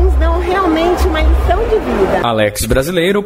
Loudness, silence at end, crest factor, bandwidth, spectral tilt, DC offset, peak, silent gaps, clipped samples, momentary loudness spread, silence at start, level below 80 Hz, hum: -13 LUFS; 0 s; 12 dB; 16 kHz; -5.5 dB/octave; under 0.1%; 0 dBFS; none; under 0.1%; 2 LU; 0 s; -16 dBFS; none